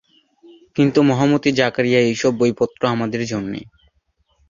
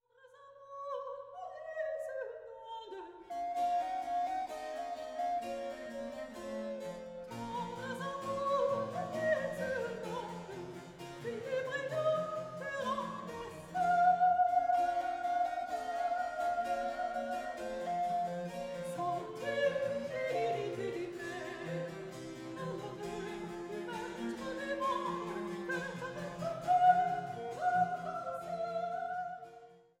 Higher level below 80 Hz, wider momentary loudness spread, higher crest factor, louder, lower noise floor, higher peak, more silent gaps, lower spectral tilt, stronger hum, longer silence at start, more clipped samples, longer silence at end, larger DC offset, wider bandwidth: first, -56 dBFS vs -68 dBFS; second, 10 LU vs 13 LU; about the same, 18 dB vs 20 dB; first, -18 LUFS vs -36 LUFS; first, -65 dBFS vs -60 dBFS; first, -2 dBFS vs -16 dBFS; neither; about the same, -6 dB/octave vs -5.5 dB/octave; neither; first, 0.75 s vs 0.25 s; neither; first, 0.85 s vs 0.2 s; neither; second, 7.4 kHz vs 14.5 kHz